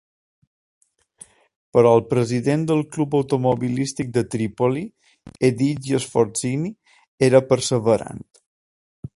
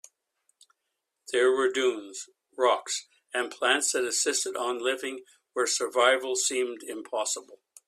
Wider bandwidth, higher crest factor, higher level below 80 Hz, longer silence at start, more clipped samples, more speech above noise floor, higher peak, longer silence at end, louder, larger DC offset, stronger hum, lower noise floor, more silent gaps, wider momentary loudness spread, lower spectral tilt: second, 11.5 kHz vs 14.5 kHz; about the same, 20 dB vs 20 dB; first, -56 dBFS vs -78 dBFS; first, 1.75 s vs 1.3 s; neither; second, 30 dB vs 55 dB; first, 0 dBFS vs -8 dBFS; second, 0.1 s vs 0.3 s; first, -20 LUFS vs -27 LUFS; neither; neither; second, -49 dBFS vs -82 dBFS; first, 7.08-7.18 s, 8.46-9.03 s vs none; second, 10 LU vs 14 LU; first, -6 dB/octave vs 0.5 dB/octave